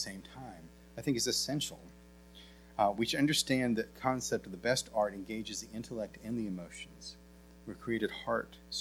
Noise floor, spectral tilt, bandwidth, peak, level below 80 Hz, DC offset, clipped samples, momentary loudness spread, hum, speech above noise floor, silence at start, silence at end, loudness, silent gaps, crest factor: -56 dBFS; -3.5 dB/octave; 19.5 kHz; -16 dBFS; -60 dBFS; under 0.1%; under 0.1%; 19 LU; none; 20 dB; 0 s; 0 s; -34 LUFS; none; 20 dB